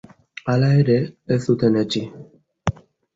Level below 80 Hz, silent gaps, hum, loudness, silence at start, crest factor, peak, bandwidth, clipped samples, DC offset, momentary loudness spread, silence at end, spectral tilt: -46 dBFS; none; none; -20 LUFS; 0.45 s; 16 dB; -4 dBFS; 7.8 kHz; under 0.1%; under 0.1%; 13 LU; 0.45 s; -7.5 dB/octave